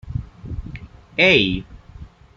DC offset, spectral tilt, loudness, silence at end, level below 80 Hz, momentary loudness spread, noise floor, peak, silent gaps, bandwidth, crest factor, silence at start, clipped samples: under 0.1%; -5.5 dB/octave; -17 LUFS; 0.3 s; -38 dBFS; 22 LU; -41 dBFS; -2 dBFS; none; 7.6 kHz; 22 dB; 0.05 s; under 0.1%